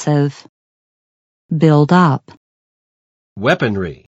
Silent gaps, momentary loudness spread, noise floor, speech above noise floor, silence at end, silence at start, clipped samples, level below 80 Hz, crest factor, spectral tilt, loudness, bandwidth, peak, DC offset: 0.49-1.49 s, 2.37-3.36 s; 13 LU; under -90 dBFS; over 76 dB; 0.2 s; 0 s; under 0.1%; -54 dBFS; 18 dB; -7.5 dB/octave; -15 LUFS; 8 kHz; 0 dBFS; under 0.1%